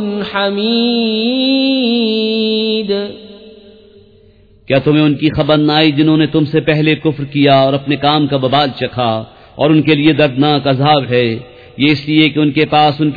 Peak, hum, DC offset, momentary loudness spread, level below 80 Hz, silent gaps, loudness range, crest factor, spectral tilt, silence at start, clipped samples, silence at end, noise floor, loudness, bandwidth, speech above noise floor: 0 dBFS; none; under 0.1%; 7 LU; -46 dBFS; none; 4 LU; 12 dB; -8.5 dB/octave; 0 s; under 0.1%; 0 s; -45 dBFS; -12 LUFS; 5 kHz; 33 dB